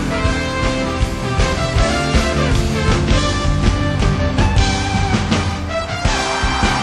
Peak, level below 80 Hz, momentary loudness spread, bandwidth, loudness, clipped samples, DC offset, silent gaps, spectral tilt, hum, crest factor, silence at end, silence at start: -2 dBFS; -22 dBFS; 4 LU; 12.5 kHz; -17 LUFS; under 0.1%; under 0.1%; none; -5 dB/octave; none; 14 dB; 0 s; 0 s